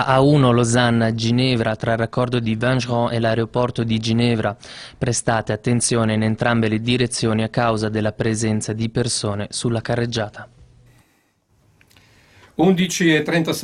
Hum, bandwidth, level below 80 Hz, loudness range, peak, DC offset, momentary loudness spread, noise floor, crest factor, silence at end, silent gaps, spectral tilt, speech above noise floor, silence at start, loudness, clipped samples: none; 14 kHz; -48 dBFS; 6 LU; -2 dBFS; under 0.1%; 7 LU; -62 dBFS; 18 dB; 0 s; none; -5 dB/octave; 43 dB; 0 s; -19 LUFS; under 0.1%